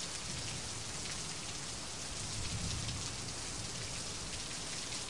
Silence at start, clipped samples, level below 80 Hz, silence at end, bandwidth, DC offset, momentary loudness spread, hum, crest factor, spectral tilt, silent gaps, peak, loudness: 0 s; under 0.1%; -54 dBFS; 0 s; 11.5 kHz; 0.3%; 3 LU; none; 18 dB; -2 dB/octave; none; -22 dBFS; -40 LUFS